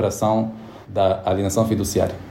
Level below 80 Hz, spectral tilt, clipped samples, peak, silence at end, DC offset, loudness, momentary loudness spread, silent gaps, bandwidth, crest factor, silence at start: -46 dBFS; -6 dB/octave; under 0.1%; -6 dBFS; 0 s; under 0.1%; -21 LUFS; 9 LU; none; 16.5 kHz; 16 dB; 0 s